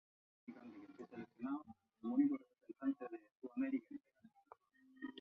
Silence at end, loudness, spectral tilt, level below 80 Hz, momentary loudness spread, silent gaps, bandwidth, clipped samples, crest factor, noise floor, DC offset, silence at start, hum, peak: 0 s; -44 LUFS; -5.5 dB/octave; -88 dBFS; 21 LU; 3.31-3.36 s; 3.9 kHz; under 0.1%; 20 dB; -71 dBFS; under 0.1%; 0.5 s; none; -24 dBFS